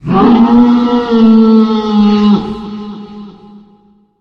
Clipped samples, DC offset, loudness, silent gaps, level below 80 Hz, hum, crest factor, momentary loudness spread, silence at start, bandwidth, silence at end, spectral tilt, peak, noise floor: under 0.1%; under 0.1%; -8 LUFS; none; -38 dBFS; none; 10 dB; 18 LU; 0.05 s; 6.2 kHz; 0.9 s; -8.5 dB/octave; 0 dBFS; -47 dBFS